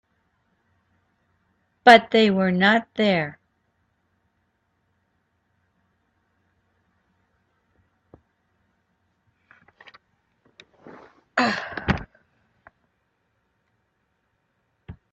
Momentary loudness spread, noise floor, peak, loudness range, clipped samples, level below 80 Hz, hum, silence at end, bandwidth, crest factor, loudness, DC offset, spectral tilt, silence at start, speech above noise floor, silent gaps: 14 LU; -72 dBFS; 0 dBFS; 14 LU; under 0.1%; -54 dBFS; none; 0.2 s; 11.5 kHz; 26 dB; -19 LUFS; under 0.1%; -5.5 dB/octave; 1.85 s; 55 dB; none